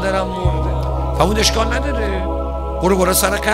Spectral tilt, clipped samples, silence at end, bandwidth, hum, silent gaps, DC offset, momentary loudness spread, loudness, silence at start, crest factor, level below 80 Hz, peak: -4.5 dB/octave; under 0.1%; 0 s; 16 kHz; none; none; under 0.1%; 7 LU; -17 LUFS; 0 s; 16 dB; -22 dBFS; 0 dBFS